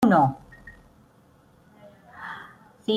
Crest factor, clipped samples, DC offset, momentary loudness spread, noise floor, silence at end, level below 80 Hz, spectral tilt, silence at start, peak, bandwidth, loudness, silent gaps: 20 dB; under 0.1%; under 0.1%; 27 LU; -57 dBFS; 0 s; -60 dBFS; -7 dB/octave; 0 s; -6 dBFS; 15 kHz; -25 LUFS; none